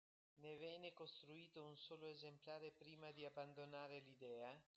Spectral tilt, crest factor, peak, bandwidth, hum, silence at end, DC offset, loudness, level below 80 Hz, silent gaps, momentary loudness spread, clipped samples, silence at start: -3 dB/octave; 16 dB; -42 dBFS; 8 kHz; none; 0.15 s; under 0.1%; -58 LUFS; under -90 dBFS; none; 5 LU; under 0.1%; 0.35 s